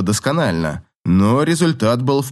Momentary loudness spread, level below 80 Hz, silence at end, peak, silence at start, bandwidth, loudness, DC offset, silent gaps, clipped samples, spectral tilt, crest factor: 8 LU; -48 dBFS; 0 s; -2 dBFS; 0 s; 12.5 kHz; -17 LUFS; under 0.1%; 0.95-1.04 s; under 0.1%; -6 dB/octave; 14 dB